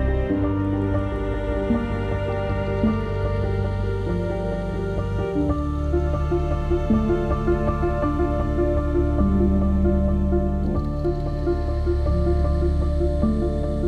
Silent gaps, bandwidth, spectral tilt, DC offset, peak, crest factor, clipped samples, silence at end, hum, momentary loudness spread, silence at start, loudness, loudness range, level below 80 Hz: none; 6.6 kHz; -9.5 dB/octave; under 0.1%; -8 dBFS; 14 dB; under 0.1%; 0 s; none; 5 LU; 0 s; -23 LUFS; 3 LU; -26 dBFS